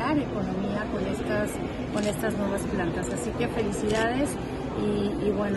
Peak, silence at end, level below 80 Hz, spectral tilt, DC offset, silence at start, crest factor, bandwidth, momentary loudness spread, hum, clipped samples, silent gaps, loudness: -14 dBFS; 0 s; -42 dBFS; -6 dB/octave; under 0.1%; 0 s; 14 dB; 12.5 kHz; 4 LU; none; under 0.1%; none; -28 LUFS